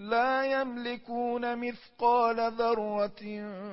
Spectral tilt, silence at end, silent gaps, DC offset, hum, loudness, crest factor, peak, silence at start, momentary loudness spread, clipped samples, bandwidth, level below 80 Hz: -8.5 dB/octave; 0 s; none; under 0.1%; none; -30 LUFS; 16 dB; -14 dBFS; 0 s; 12 LU; under 0.1%; 5.8 kHz; -66 dBFS